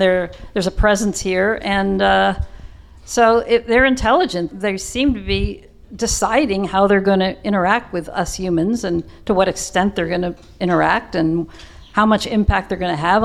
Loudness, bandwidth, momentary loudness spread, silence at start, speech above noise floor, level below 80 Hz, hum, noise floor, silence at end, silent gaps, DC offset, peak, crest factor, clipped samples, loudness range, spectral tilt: -18 LUFS; 14.5 kHz; 9 LU; 0 s; 21 dB; -32 dBFS; none; -38 dBFS; 0 s; none; under 0.1%; -2 dBFS; 16 dB; under 0.1%; 3 LU; -4.5 dB/octave